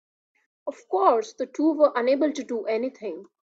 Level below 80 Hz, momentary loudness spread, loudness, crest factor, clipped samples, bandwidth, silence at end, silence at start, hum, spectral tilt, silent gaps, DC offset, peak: -76 dBFS; 16 LU; -24 LUFS; 18 dB; under 0.1%; 7.8 kHz; 0.2 s; 0.65 s; none; -4 dB/octave; none; under 0.1%; -6 dBFS